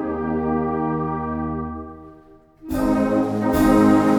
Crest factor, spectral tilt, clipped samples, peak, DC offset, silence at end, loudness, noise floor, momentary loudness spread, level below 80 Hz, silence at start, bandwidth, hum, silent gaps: 16 dB; -7.5 dB/octave; under 0.1%; -4 dBFS; under 0.1%; 0 s; -21 LUFS; -48 dBFS; 14 LU; -38 dBFS; 0 s; 20 kHz; none; none